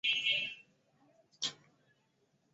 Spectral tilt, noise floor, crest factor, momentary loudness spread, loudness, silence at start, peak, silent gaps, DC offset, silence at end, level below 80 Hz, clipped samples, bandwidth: 1 dB/octave; -76 dBFS; 20 dB; 12 LU; -34 LUFS; 0.05 s; -20 dBFS; none; under 0.1%; 1 s; -86 dBFS; under 0.1%; 8.2 kHz